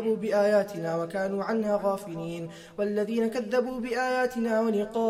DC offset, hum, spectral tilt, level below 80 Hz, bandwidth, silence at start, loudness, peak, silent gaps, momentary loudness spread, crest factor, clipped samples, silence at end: under 0.1%; none; -6 dB/octave; -62 dBFS; 15.5 kHz; 0 s; -28 LUFS; -14 dBFS; none; 9 LU; 14 dB; under 0.1%; 0 s